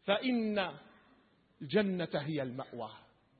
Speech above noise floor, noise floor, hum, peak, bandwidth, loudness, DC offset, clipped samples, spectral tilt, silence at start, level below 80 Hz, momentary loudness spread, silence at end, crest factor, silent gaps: 33 dB; -68 dBFS; none; -18 dBFS; 4.6 kHz; -35 LUFS; under 0.1%; under 0.1%; -4 dB/octave; 0.05 s; -74 dBFS; 15 LU; 0.4 s; 18 dB; none